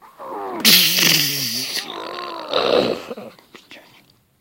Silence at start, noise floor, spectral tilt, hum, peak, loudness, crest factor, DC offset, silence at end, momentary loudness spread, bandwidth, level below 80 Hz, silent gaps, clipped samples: 0.05 s; -54 dBFS; -1.5 dB/octave; none; 0 dBFS; -15 LUFS; 20 dB; under 0.1%; 0.6 s; 20 LU; 17 kHz; -62 dBFS; none; under 0.1%